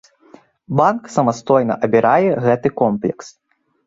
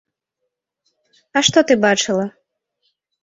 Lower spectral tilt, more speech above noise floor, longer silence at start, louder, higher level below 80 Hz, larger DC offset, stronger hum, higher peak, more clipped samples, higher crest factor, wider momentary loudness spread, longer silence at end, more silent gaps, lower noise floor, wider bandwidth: first, -7 dB/octave vs -3 dB/octave; second, 32 dB vs 62 dB; second, 0.7 s vs 1.35 s; about the same, -16 LUFS vs -16 LUFS; about the same, -58 dBFS vs -62 dBFS; neither; neither; about the same, -2 dBFS vs 0 dBFS; neither; about the same, 16 dB vs 20 dB; about the same, 8 LU vs 9 LU; second, 0.6 s vs 0.95 s; neither; second, -48 dBFS vs -78 dBFS; about the same, 8 kHz vs 8.2 kHz